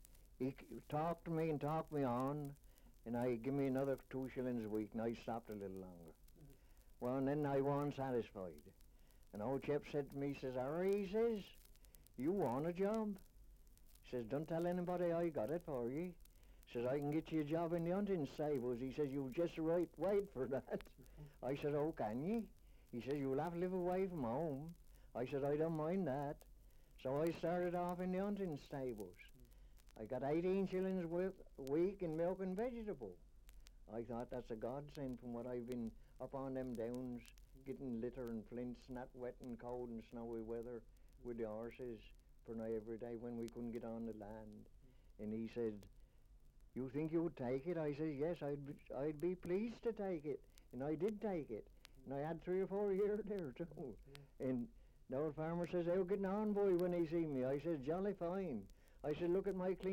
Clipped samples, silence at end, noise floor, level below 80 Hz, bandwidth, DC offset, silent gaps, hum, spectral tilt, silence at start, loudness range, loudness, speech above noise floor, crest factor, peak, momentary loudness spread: under 0.1%; 0 s; -65 dBFS; -64 dBFS; 16.5 kHz; under 0.1%; none; none; -8 dB/octave; 0 s; 8 LU; -44 LUFS; 23 dB; 16 dB; -28 dBFS; 13 LU